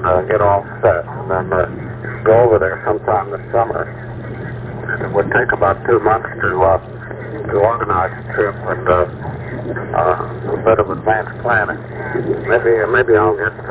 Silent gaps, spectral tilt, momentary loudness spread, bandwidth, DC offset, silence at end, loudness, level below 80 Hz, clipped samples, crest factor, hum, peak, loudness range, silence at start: none; -11 dB/octave; 13 LU; 4 kHz; under 0.1%; 0 s; -16 LUFS; -36 dBFS; under 0.1%; 14 dB; none; -2 dBFS; 2 LU; 0 s